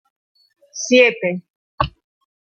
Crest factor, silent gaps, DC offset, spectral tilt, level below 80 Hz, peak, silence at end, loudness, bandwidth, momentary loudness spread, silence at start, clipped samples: 20 dB; 1.50-1.78 s; under 0.1%; -3.5 dB/octave; -44 dBFS; -2 dBFS; 0.6 s; -17 LUFS; 7 kHz; 17 LU; 0.75 s; under 0.1%